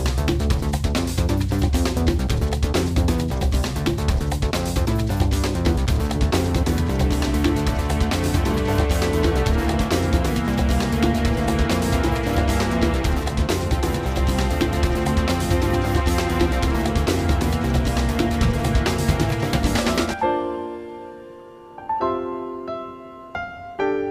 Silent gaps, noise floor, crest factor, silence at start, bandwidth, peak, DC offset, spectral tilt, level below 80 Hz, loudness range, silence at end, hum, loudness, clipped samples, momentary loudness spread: none; -41 dBFS; 14 dB; 0 s; 16 kHz; -6 dBFS; under 0.1%; -6 dB/octave; -24 dBFS; 3 LU; 0 s; none; -22 LUFS; under 0.1%; 8 LU